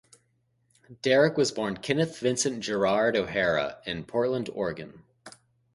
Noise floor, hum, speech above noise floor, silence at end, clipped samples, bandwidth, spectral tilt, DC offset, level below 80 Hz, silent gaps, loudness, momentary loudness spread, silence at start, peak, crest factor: -71 dBFS; none; 45 dB; 0.45 s; under 0.1%; 11.5 kHz; -4 dB/octave; under 0.1%; -60 dBFS; none; -27 LUFS; 10 LU; 0.9 s; -8 dBFS; 20 dB